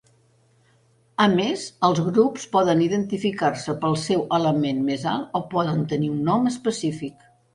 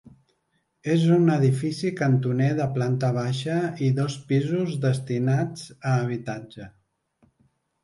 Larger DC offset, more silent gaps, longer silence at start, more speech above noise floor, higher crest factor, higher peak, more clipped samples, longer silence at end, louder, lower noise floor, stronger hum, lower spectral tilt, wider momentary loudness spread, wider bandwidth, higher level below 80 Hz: neither; neither; first, 1.2 s vs 0.05 s; second, 38 dB vs 49 dB; about the same, 18 dB vs 16 dB; first, -4 dBFS vs -8 dBFS; neither; second, 0.45 s vs 1.15 s; about the same, -22 LUFS vs -24 LUFS; second, -60 dBFS vs -72 dBFS; neither; second, -6 dB/octave vs -7.5 dB/octave; second, 7 LU vs 12 LU; about the same, 11.5 kHz vs 11.5 kHz; about the same, -60 dBFS vs -64 dBFS